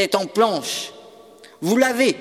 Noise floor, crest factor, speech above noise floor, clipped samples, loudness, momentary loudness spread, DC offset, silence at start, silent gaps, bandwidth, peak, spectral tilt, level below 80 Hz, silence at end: -46 dBFS; 18 dB; 26 dB; under 0.1%; -20 LUFS; 11 LU; under 0.1%; 0 s; none; 17 kHz; -2 dBFS; -3.5 dB/octave; -72 dBFS; 0 s